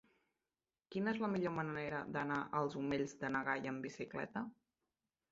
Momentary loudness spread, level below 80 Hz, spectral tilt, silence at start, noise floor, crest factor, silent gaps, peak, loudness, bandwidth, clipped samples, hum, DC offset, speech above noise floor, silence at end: 7 LU; -74 dBFS; -5 dB/octave; 0.9 s; under -90 dBFS; 20 dB; none; -22 dBFS; -41 LUFS; 7.6 kHz; under 0.1%; none; under 0.1%; over 50 dB; 0.8 s